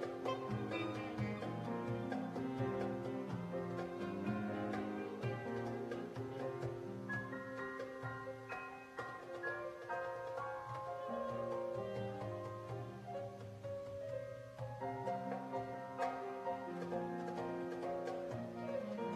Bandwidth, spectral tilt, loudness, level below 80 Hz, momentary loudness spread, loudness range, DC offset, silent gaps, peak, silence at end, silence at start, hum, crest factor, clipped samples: 13.5 kHz; -7 dB/octave; -44 LUFS; -72 dBFS; 6 LU; 4 LU; under 0.1%; none; -26 dBFS; 0 s; 0 s; none; 16 dB; under 0.1%